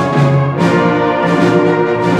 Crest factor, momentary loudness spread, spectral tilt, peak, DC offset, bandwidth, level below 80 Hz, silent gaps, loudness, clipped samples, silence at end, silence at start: 12 dB; 2 LU; -7.5 dB/octave; 0 dBFS; under 0.1%; 10.5 kHz; -48 dBFS; none; -12 LUFS; under 0.1%; 0 s; 0 s